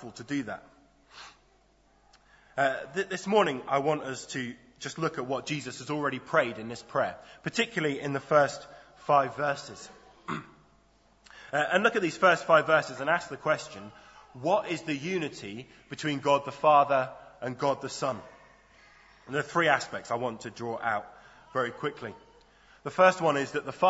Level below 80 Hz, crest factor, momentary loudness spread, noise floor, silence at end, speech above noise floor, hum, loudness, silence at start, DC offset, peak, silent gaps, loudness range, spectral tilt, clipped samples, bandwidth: -68 dBFS; 24 dB; 18 LU; -64 dBFS; 0 s; 36 dB; none; -28 LUFS; 0 s; under 0.1%; -6 dBFS; none; 5 LU; -4.5 dB/octave; under 0.1%; 8 kHz